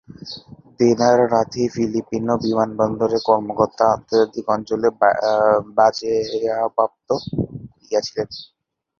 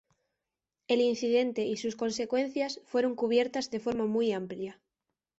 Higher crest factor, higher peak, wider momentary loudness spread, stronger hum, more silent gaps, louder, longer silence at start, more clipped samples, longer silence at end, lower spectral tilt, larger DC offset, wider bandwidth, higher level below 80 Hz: about the same, 18 dB vs 16 dB; first, -2 dBFS vs -14 dBFS; first, 11 LU vs 7 LU; neither; neither; first, -19 LUFS vs -30 LUFS; second, 0.25 s vs 0.9 s; neither; about the same, 0.55 s vs 0.65 s; about the same, -5.5 dB/octave vs -4.5 dB/octave; neither; second, 7.2 kHz vs 8 kHz; first, -52 dBFS vs -72 dBFS